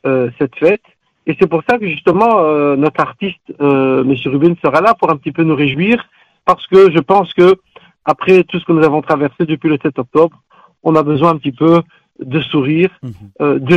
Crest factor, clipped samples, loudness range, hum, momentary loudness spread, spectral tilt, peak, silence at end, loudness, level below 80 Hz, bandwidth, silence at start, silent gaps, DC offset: 12 dB; under 0.1%; 3 LU; none; 8 LU; -8 dB/octave; 0 dBFS; 0 s; -13 LUFS; -52 dBFS; 7.8 kHz; 0.05 s; none; under 0.1%